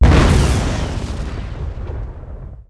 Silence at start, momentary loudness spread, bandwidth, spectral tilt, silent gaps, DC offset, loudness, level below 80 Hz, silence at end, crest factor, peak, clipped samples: 0 s; 19 LU; 11 kHz; -6 dB/octave; none; under 0.1%; -19 LUFS; -18 dBFS; 0.05 s; 12 dB; -4 dBFS; under 0.1%